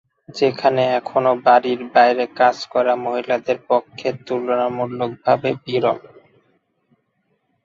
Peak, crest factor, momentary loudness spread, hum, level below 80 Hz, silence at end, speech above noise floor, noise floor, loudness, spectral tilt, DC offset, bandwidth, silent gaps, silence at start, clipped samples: -2 dBFS; 18 dB; 9 LU; none; -64 dBFS; 1.65 s; 50 dB; -68 dBFS; -19 LUFS; -6 dB/octave; under 0.1%; 7.6 kHz; none; 0.3 s; under 0.1%